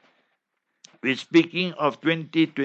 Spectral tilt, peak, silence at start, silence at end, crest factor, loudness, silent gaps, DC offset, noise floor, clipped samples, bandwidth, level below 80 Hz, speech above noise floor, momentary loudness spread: -6 dB/octave; -4 dBFS; 1.05 s; 0 s; 20 dB; -23 LUFS; none; under 0.1%; -77 dBFS; under 0.1%; 8 kHz; -76 dBFS; 54 dB; 7 LU